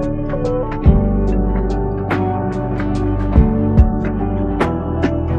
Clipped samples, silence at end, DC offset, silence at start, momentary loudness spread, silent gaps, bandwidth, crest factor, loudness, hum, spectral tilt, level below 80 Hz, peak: under 0.1%; 0 s; under 0.1%; 0 s; 6 LU; none; 7.4 kHz; 16 dB; -17 LUFS; none; -9.5 dB/octave; -20 dBFS; 0 dBFS